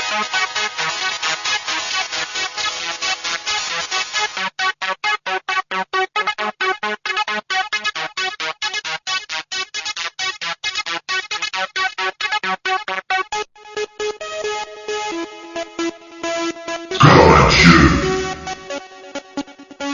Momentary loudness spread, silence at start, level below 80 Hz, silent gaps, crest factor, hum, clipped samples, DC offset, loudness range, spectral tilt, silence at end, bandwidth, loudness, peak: 15 LU; 0 s; -36 dBFS; none; 20 dB; none; under 0.1%; under 0.1%; 9 LU; -4 dB/octave; 0 s; 7.6 kHz; -18 LUFS; 0 dBFS